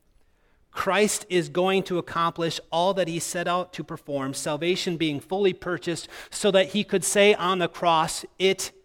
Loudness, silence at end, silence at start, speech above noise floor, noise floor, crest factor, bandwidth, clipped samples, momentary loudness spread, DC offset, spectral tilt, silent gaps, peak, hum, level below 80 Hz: -24 LUFS; 0.15 s; 0.75 s; 37 dB; -62 dBFS; 18 dB; 17 kHz; under 0.1%; 9 LU; under 0.1%; -3.5 dB/octave; none; -6 dBFS; none; -60 dBFS